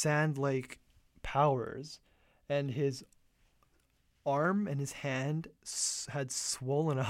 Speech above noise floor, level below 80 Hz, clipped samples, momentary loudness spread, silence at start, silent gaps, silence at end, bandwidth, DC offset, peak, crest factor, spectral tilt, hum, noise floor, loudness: 39 dB; -60 dBFS; under 0.1%; 16 LU; 0 s; none; 0 s; 15.5 kHz; under 0.1%; -16 dBFS; 20 dB; -4.5 dB/octave; none; -72 dBFS; -34 LUFS